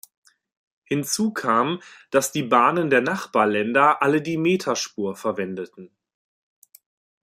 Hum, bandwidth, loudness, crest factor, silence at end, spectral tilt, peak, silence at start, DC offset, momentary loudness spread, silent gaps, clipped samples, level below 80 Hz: none; 16 kHz; -21 LUFS; 20 dB; 1.35 s; -4.5 dB/octave; -4 dBFS; 0.9 s; under 0.1%; 10 LU; none; under 0.1%; -68 dBFS